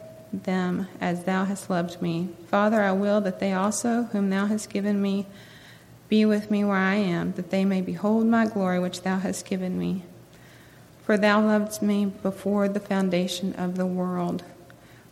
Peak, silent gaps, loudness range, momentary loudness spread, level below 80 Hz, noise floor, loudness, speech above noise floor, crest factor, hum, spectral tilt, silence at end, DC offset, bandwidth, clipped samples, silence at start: -6 dBFS; none; 2 LU; 8 LU; -64 dBFS; -50 dBFS; -25 LUFS; 26 dB; 18 dB; none; -6 dB/octave; 0.4 s; under 0.1%; 15 kHz; under 0.1%; 0 s